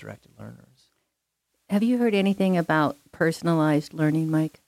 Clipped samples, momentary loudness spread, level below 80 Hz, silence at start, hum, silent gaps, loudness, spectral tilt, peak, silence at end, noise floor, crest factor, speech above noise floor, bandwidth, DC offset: under 0.1%; 18 LU; -66 dBFS; 0 s; none; none; -23 LUFS; -7 dB/octave; -10 dBFS; 0.2 s; -79 dBFS; 14 dB; 55 dB; 15.5 kHz; under 0.1%